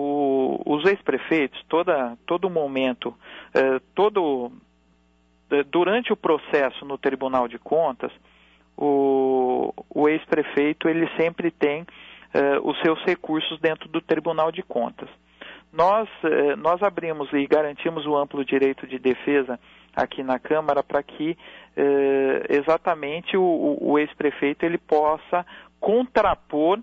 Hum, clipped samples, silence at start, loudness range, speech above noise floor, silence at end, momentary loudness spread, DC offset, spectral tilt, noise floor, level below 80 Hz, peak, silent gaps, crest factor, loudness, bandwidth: none; under 0.1%; 0 s; 2 LU; 39 dB; 0 s; 8 LU; under 0.1%; -7 dB/octave; -61 dBFS; -58 dBFS; -8 dBFS; none; 16 dB; -23 LUFS; 6.6 kHz